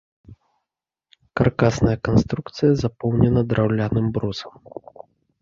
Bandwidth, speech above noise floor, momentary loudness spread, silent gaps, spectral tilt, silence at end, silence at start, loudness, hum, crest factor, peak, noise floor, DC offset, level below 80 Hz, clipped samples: 7.6 kHz; 65 dB; 16 LU; none; -7.5 dB/octave; 0.9 s; 0.3 s; -20 LUFS; none; 20 dB; -2 dBFS; -85 dBFS; under 0.1%; -40 dBFS; under 0.1%